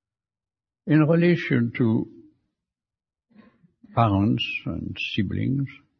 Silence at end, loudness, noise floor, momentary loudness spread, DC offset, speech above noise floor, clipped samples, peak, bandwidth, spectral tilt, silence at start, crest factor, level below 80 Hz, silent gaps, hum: 0.25 s; -23 LUFS; under -90 dBFS; 10 LU; under 0.1%; over 68 dB; under 0.1%; -6 dBFS; 6.4 kHz; -8.5 dB/octave; 0.85 s; 18 dB; -56 dBFS; none; none